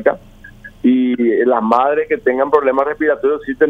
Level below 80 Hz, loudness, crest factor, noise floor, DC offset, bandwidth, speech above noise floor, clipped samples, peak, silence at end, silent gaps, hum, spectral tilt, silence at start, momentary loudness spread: -48 dBFS; -15 LUFS; 14 dB; -38 dBFS; under 0.1%; 5.2 kHz; 24 dB; under 0.1%; 0 dBFS; 0 s; none; none; -7.5 dB/octave; 0 s; 5 LU